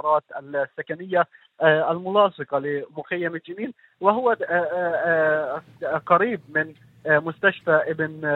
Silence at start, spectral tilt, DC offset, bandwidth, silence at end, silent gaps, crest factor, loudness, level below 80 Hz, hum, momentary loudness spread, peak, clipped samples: 0.05 s; -8 dB/octave; under 0.1%; 4.2 kHz; 0 s; none; 20 dB; -23 LUFS; -72 dBFS; none; 11 LU; -2 dBFS; under 0.1%